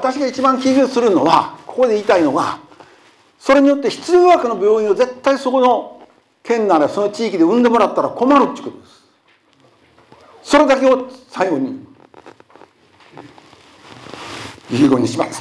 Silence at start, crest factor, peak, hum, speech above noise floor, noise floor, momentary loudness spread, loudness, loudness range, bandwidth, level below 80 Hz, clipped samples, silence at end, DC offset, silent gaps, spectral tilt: 0 s; 16 dB; 0 dBFS; none; 41 dB; -55 dBFS; 18 LU; -15 LUFS; 8 LU; 11 kHz; -56 dBFS; under 0.1%; 0 s; under 0.1%; none; -5 dB/octave